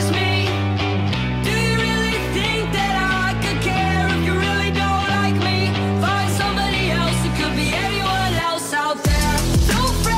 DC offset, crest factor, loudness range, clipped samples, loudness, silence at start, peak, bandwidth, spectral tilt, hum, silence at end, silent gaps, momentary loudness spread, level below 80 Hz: under 0.1%; 10 dB; 1 LU; under 0.1%; -19 LUFS; 0 s; -8 dBFS; 16 kHz; -4.5 dB/octave; none; 0 s; none; 2 LU; -28 dBFS